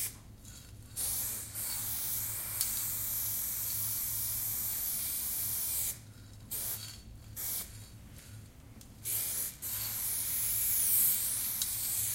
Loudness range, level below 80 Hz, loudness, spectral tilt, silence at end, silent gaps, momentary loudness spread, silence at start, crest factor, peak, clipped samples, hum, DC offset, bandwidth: 8 LU; -56 dBFS; -32 LUFS; -0.5 dB/octave; 0 s; none; 22 LU; 0 s; 26 dB; -10 dBFS; under 0.1%; none; under 0.1%; 16 kHz